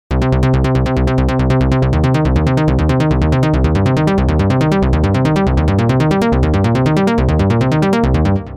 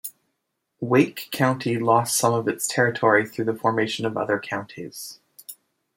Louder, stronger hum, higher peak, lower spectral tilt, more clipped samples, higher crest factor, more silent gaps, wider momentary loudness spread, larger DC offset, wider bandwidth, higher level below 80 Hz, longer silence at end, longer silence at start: first, -14 LUFS vs -22 LUFS; neither; about the same, -2 dBFS vs -4 dBFS; first, -8 dB/octave vs -4.5 dB/octave; neither; second, 10 dB vs 20 dB; neither; second, 1 LU vs 18 LU; neither; second, 10.5 kHz vs 16.5 kHz; first, -20 dBFS vs -68 dBFS; second, 0 s vs 0.45 s; about the same, 0.1 s vs 0.05 s